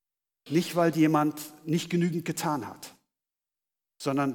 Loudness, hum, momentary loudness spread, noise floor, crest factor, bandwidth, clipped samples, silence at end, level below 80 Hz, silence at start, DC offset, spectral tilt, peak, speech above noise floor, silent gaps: -28 LUFS; none; 16 LU; -90 dBFS; 18 dB; 19 kHz; under 0.1%; 0 s; -76 dBFS; 0.45 s; under 0.1%; -6 dB/octave; -12 dBFS; 63 dB; none